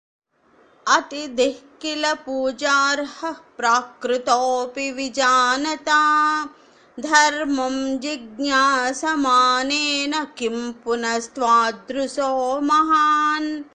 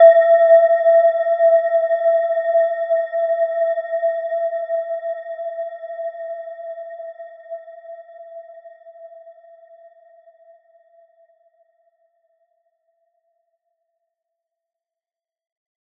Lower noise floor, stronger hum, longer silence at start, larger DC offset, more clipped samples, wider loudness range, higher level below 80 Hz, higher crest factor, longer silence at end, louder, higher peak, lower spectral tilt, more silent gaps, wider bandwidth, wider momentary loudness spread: second, -57 dBFS vs under -90 dBFS; neither; first, 0.85 s vs 0 s; neither; neither; second, 3 LU vs 24 LU; first, -62 dBFS vs under -90 dBFS; about the same, 20 dB vs 20 dB; second, 0.1 s vs 6.65 s; second, -20 LUFS vs -17 LUFS; about the same, 0 dBFS vs -2 dBFS; about the same, -1 dB/octave vs -2 dB/octave; neither; first, 10 kHz vs 3.7 kHz; second, 10 LU vs 25 LU